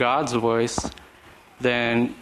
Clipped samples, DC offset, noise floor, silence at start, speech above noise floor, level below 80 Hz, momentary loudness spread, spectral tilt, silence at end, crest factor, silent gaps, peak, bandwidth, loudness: under 0.1%; under 0.1%; -50 dBFS; 0 s; 27 dB; -50 dBFS; 7 LU; -4.5 dB/octave; 0 s; 18 dB; none; -6 dBFS; 13.5 kHz; -23 LUFS